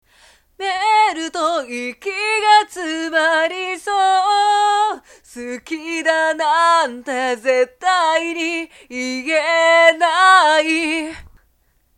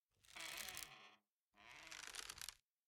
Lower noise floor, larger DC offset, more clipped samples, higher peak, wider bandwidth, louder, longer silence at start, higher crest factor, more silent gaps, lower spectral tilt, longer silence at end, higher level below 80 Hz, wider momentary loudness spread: second, -61 dBFS vs -76 dBFS; neither; neither; first, 0 dBFS vs -28 dBFS; second, 14 kHz vs 18 kHz; first, -16 LUFS vs -52 LUFS; first, 0.6 s vs 0.25 s; second, 18 dB vs 28 dB; second, none vs 1.30-1.51 s; about the same, -0.5 dB/octave vs 0.5 dB/octave; first, 0.75 s vs 0.25 s; first, -58 dBFS vs -78 dBFS; about the same, 14 LU vs 14 LU